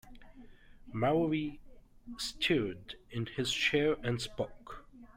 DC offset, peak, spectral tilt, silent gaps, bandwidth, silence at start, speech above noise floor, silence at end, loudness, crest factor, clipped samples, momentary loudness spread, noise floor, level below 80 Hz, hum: under 0.1%; -16 dBFS; -5 dB/octave; none; 16 kHz; 0.05 s; 20 dB; 0.1 s; -33 LUFS; 18 dB; under 0.1%; 18 LU; -54 dBFS; -56 dBFS; none